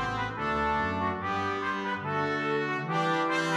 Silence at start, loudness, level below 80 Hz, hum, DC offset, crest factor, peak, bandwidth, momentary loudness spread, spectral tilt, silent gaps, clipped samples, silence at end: 0 s; -29 LUFS; -52 dBFS; none; under 0.1%; 14 dB; -16 dBFS; 14 kHz; 4 LU; -5.5 dB/octave; none; under 0.1%; 0 s